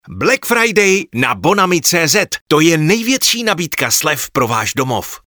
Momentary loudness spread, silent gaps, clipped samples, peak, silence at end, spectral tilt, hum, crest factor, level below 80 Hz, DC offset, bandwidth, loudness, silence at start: 5 LU; 2.41-2.46 s; under 0.1%; 0 dBFS; 0.1 s; -3 dB/octave; none; 14 dB; -50 dBFS; 0.1%; over 20 kHz; -13 LUFS; 0.05 s